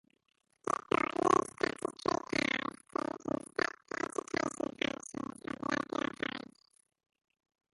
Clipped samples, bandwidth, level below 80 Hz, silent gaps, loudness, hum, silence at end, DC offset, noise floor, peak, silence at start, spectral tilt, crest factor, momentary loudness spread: under 0.1%; 11.5 kHz; -68 dBFS; none; -35 LUFS; none; 1.35 s; under 0.1%; -54 dBFS; -12 dBFS; 0.65 s; -4 dB/octave; 24 dB; 11 LU